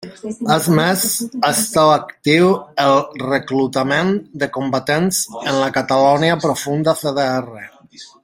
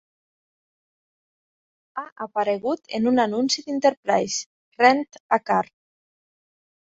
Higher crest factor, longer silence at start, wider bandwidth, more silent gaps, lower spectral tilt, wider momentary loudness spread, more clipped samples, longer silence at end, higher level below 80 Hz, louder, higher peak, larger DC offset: second, 16 dB vs 22 dB; second, 0 s vs 1.95 s; first, 16.5 kHz vs 8 kHz; second, none vs 2.12-2.16 s, 3.97-4.03 s, 4.46-4.72 s, 5.20-5.29 s; about the same, -4.5 dB/octave vs -3.5 dB/octave; second, 8 LU vs 17 LU; neither; second, 0.2 s vs 1.3 s; first, -56 dBFS vs -70 dBFS; first, -16 LUFS vs -22 LUFS; about the same, 0 dBFS vs -2 dBFS; neither